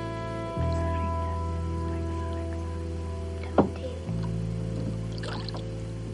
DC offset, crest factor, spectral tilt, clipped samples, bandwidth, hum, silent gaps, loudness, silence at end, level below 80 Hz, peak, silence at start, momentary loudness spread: under 0.1%; 24 dB; -7.5 dB/octave; under 0.1%; 11 kHz; none; none; -31 LUFS; 0 s; -38 dBFS; -8 dBFS; 0 s; 7 LU